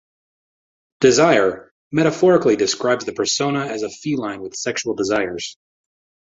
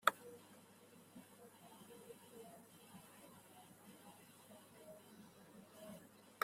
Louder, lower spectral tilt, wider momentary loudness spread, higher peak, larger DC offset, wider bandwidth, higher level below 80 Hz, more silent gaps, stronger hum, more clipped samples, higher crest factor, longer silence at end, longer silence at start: first, -19 LUFS vs -55 LUFS; first, -4 dB/octave vs -2.5 dB/octave; first, 12 LU vs 5 LU; first, -2 dBFS vs -12 dBFS; neither; second, 8 kHz vs 16 kHz; first, -58 dBFS vs under -90 dBFS; first, 1.71-1.91 s vs none; neither; neither; second, 18 dB vs 38 dB; first, 0.7 s vs 0 s; first, 1 s vs 0 s